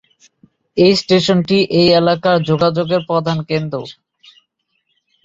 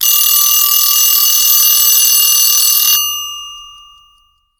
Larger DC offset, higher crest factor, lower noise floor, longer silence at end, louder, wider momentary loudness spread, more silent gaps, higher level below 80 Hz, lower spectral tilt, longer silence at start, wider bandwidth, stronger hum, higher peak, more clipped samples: neither; about the same, 16 dB vs 12 dB; first, -68 dBFS vs -53 dBFS; first, 1.35 s vs 0.9 s; second, -14 LUFS vs -7 LUFS; about the same, 11 LU vs 12 LU; neither; about the same, -52 dBFS vs -56 dBFS; first, -6 dB/octave vs 6 dB/octave; first, 0.75 s vs 0 s; second, 7.8 kHz vs over 20 kHz; neither; about the same, 0 dBFS vs 0 dBFS; neither